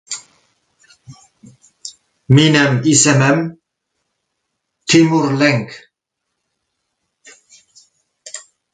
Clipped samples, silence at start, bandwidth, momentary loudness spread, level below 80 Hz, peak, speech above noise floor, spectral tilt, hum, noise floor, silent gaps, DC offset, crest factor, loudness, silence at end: under 0.1%; 0.1 s; 9.4 kHz; 23 LU; -54 dBFS; 0 dBFS; 64 dB; -4.5 dB/octave; none; -76 dBFS; none; under 0.1%; 18 dB; -13 LUFS; 0.35 s